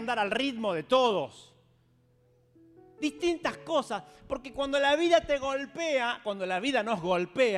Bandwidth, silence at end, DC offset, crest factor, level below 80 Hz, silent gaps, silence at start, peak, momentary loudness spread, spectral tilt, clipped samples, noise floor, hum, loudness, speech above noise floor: 12 kHz; 0 s; under 0.1%; 20 dB; -60 dBFS; none; 0 s; -10 dBFS; 11 LU; -4 dB/octave; under 0.1%; -66 dBFS; none; -29 LUFS; 37 dB